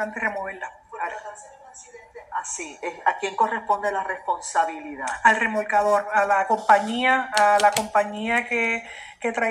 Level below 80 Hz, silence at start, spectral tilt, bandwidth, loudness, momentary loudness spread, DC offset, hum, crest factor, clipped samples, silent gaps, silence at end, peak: -62 dBFS; 0 s; -2 dB/octave; 16 kHz; -22 LUFS; 14 LU; under 0.1%; none; 20 dB; under 0.1%; none; 0 s; -4 dBFS